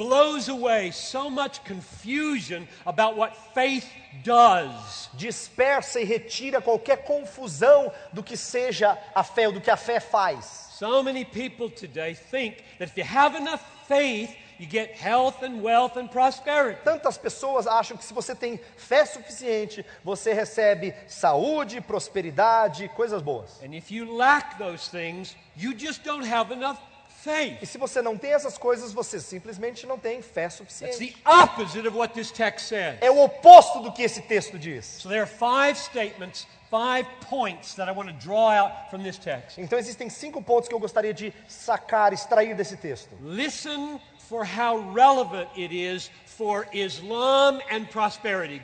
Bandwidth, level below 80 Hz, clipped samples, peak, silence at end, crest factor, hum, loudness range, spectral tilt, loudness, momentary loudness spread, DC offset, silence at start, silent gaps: 9.4 kHz; -66 dBFS; under 0.1%; 0 dBFS; 0 s; 24 dB; none; 10 LU; -3.5 dB/octave; -23 LUFS; 16 LU; under 0.1%; 0 s; none